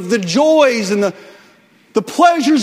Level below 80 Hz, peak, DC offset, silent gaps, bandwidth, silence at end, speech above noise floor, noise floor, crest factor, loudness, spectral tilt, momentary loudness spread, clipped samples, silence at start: -62 dBFS; 0 dBFS; under 0.1%; none; 16 kHz; 0 s; 36 dB; -49 dBFS; 14 dB; -14 LUFS; -4.5 dB/octave; 10 LU; under 0.1%; 0 s